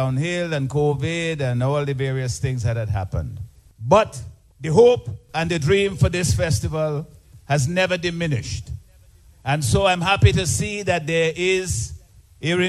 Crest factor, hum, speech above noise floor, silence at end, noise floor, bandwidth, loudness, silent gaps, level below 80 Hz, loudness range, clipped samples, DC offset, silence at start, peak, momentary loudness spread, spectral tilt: 20 dB; none; 30 dB; 0 s; -50 dBFS; 13 kHz; -21 LUFS; none; -38 dBFS; 4 LU; under 0.1%; under 0.1%; 0 s; -2 dBFS; 15 LU; -5 dB/octave